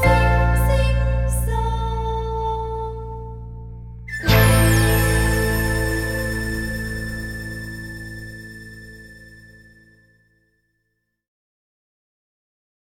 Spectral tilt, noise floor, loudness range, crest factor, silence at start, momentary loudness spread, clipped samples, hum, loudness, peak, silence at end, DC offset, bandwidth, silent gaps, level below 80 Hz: -5 dB/octave; -74 dBFS; 18 LU; 20 dB; 0 s; 21 LU; under 0.1%; none; -20 LUFS; -2 dBFS; 3.5 s; under 0.1%; 16.5 kHz; none; -26 dBFS